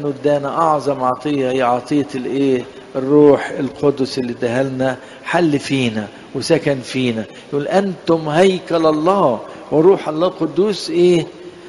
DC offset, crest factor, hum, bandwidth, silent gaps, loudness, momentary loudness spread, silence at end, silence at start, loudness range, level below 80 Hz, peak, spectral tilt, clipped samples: under 0.1%; 16 dB; none; 11.5 kHz; none; -17 LUFS; 9 LU; 0 s; 0 s; 3 LU; -54 dBFS; 0 dBFS; -6 dB/octave; under 0.1%